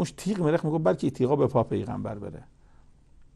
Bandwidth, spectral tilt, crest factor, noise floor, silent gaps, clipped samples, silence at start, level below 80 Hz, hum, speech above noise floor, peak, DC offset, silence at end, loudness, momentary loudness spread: 12.5 kHz; -7.5 dB/octave; 18 dB; -55 dBFS; none; under 0.1%; 0 s; -54 dBFS; none; 28 dB; -10 dBFS; under 0.1%; 0.1 s; -26 LUFS; 14 LU